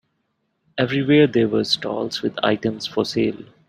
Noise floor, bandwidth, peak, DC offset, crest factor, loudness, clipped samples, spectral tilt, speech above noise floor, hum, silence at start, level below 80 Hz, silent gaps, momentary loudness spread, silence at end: -71 dBFS; 14 kHz; -2 dBFS; under 0.1%; 18 dB; -20 LUFS; under 0.1%; -5.5 dB/octave; 52 dB; none; 0.75 s; -60 dBFS; none; 9 LU; 0.25 s